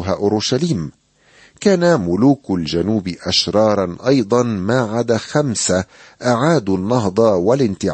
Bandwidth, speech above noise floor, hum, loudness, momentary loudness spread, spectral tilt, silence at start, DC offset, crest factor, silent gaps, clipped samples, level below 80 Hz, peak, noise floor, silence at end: 8.8 kHz; 34 dB; none; -17 LUFS; 6 LU; -5 dB/octave; 0 s; under 0.1%; 14 dB; none; under 0.1%; -48 dBFS; -2 dBFS; -50 dBFS; 0 s